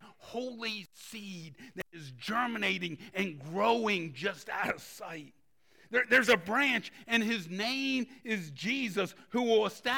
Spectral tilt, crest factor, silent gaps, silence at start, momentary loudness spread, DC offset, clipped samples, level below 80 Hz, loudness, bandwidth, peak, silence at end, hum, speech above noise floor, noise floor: -4 dB/octave; 22 dB; none; 0 s; 17 LU; under 0.1%; under 0.1%; -74 dBFS; -31 LUFS; 18 kHz; -12 dBFS; 0 s; none; 33 dB; -66 dBFS